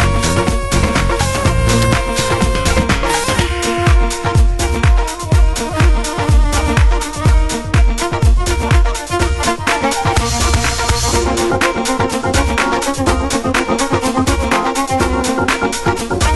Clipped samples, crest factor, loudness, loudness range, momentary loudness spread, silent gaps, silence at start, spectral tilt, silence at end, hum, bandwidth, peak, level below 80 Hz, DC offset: under 0.1%; 14 dB; -15 LUFS; 1 LU; 2 LU; none; 0 s; -4.5 dB/octave; 0 s; none; 12.5 kHz; 0 dBFS; -18 dBFS; under 0.1%